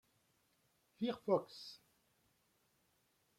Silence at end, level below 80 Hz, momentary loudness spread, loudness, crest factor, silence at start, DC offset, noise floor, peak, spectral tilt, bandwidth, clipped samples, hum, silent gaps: 1.65 s; -86 dBFS; 16 LU; -40 LUFS; 24 dB; 1 s; under 0.1%; -79 dBFS; -22 dBFS; -6.5 dB/octave; 16.5 kHz; under 0.1%; none; none